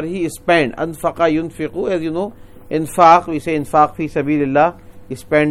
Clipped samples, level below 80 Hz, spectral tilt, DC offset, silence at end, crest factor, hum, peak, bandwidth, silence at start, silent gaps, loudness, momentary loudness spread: under 0.1%; -44 dBFS; -6 dB/octave; under 0.1%; 0 s; 16 dB; none; 0 dBFS; 15.5 kHz; 0 s; none; -16 LUFS; 13 LU